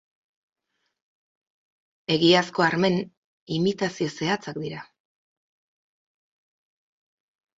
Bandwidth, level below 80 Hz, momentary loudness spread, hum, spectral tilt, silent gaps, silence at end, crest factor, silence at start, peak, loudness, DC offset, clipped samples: 7.8 kHz; -66 dBFS; 17 LU; none; -5 dB/octave; 3.17-3.47 s; 2.75 s; 24 dB; 2.1 s; -4 dBFS; -24 LUFS; under 0.1%; under 0.1%